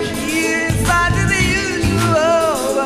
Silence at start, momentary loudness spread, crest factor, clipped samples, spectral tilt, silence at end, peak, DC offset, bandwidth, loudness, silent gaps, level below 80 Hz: 0 s; 3 LU; 12 dB; under 0.1%; -4.5 dB/octave; 0 s; -4 dBFS; under 0.1%; 15.5 kHz; -15 LUFS; none; -30 dBFS